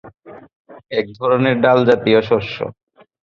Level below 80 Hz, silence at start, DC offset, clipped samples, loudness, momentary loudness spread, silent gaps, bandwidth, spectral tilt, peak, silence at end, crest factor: -54 dBFS; 0.05 s; under 0.1%; under 0.1%; -16 LUFS; 12 LU; 0.56-0.65 s; 7 kHz; -7.5 dB/octave; -2 dBFS; 0.5 s; 16 dB